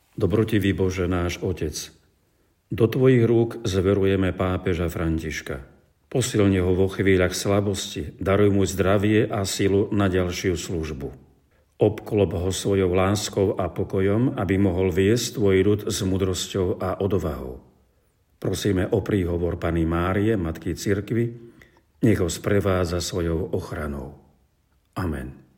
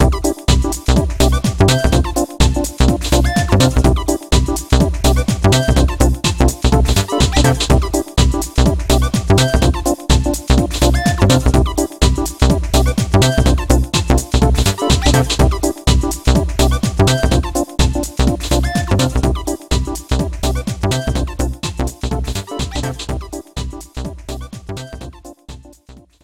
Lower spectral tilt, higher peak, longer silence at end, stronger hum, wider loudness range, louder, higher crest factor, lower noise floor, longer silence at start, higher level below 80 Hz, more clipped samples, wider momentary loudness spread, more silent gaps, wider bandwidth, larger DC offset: about the same, -6 dB/octave vs -5 dB/octave; second, -6 dBFS vs 0 dBFS; about the same, 0.2 s vs 0.3 s; neither; second, 4 LU vs 8 LU; second, -23 LUFS vs -15 LUFS; about the same, 18 dB vs 14 dB; first, -65 dBFS vs -43 dBFS; first, 0.2 s vs 0 s; second, -46 dBFS vs -18 dBFS; neither; about the same, 10 LU vs 10 LU; neither; about the same, 17 kHz vs 16.5 kHz; second, under 0.1% vs 0.2%